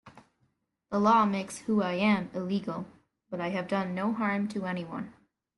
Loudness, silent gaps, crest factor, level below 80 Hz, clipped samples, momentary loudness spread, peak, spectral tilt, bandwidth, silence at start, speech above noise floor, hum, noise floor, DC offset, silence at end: -29 LUFS; none; 18 dB; -70 dBFS; under 0.1%; 15 LU; -12 dBFS; -6 dB/octave; 11.5 kHz; 0.05 s; 46 dB; none; -75 dBFS; under 0.1%; 0.45 s